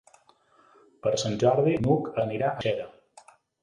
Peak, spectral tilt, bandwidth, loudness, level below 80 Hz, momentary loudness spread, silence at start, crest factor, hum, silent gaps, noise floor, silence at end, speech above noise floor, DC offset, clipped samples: -8 dBFS; -6 dB/octave; 11 kHz; -26 LUFS; -58 dBFS; 9 LU; 1.05 s; 20 dB; none; none; -61 dBFS; 0.75 s; 36 dB; under 0.1%; under 0.1%